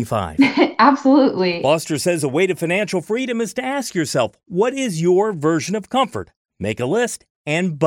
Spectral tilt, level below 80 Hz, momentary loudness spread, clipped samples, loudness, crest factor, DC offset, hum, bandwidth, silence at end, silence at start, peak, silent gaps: -5 dB/octave; -54 dBFS; 9 LU; under 0.1%; -18 LUFS; 18 dB; under 0.1%; none; 16.5 kHz; 0 s; 0 s; -2 dBFS; 6.36-6.45 s, 7.30-7.45 s